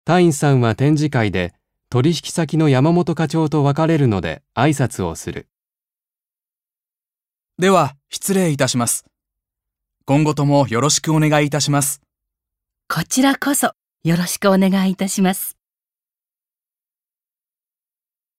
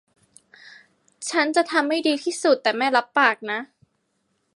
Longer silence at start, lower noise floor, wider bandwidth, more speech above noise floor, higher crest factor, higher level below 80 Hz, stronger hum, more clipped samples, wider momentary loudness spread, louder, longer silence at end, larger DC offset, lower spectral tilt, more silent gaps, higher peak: second, 0.05 s vs 0.65 s; first, under -90 dBFS vs -71 dBFS; first, 16 kHz vs 11.5 kHz; first, over 74 dB vs 50 dB; about the same, 18 dB vs 20 dB; first, -52 dBFS vs -80 dBFS; neither; neither; about the same, 10 LU vs 9 LU; first, -17 LUFS vs -21 LUFS; first, 2.9 s vs 0.9 s; neither; first, -5 dB/octave vs -1.5 dB/octave; neither; about the same, -2 dBFS vs -4 dBFS